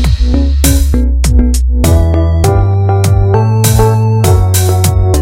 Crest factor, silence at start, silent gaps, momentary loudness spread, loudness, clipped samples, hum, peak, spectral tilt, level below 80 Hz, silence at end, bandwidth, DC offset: 8 dB; 0 s; none; 2 LU; -10 LUFS; 0.5%; none; 0 dBFS; -6 dB/octave; -12 dBFS; 0 s; 17 kHz; under 0.1%